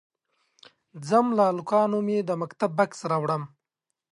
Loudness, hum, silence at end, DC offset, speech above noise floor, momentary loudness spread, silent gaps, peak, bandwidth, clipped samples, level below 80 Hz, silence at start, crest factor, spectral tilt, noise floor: -25 LUFS; none; 0.65 s; under 0.1%; 60 dB; 8 LU; none; -8 dBFS; 11.5 kHz; under 0.1%; -76 dBFS; 0.95 s; 18 dB; -7 dB/octave; -84 dBFS